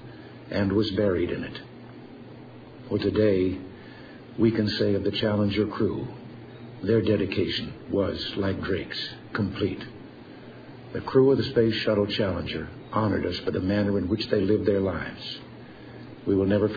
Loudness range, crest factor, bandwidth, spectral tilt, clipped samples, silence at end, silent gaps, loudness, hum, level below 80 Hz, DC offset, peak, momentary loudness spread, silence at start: 4 LU; 18 dB; 5 kHz; -8 dB/octave; under 0.1%; 0 s; none; -26 LUFS; none; -52 dBFS; under 0.1%; -8 dBFS; 21 LU; 0 s